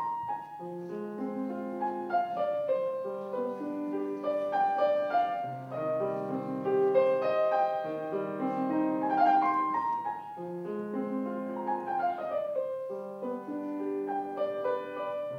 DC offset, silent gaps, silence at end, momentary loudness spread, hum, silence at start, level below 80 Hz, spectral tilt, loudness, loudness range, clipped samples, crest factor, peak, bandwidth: under 0.1%; none; 0 s; 11 LU; none; 0 s; -84 dBFS; -8 dB/octave; -31 LUFS; 6 LU; under 0.1%; 18 dB; -14 dBFS; 11.5 kHz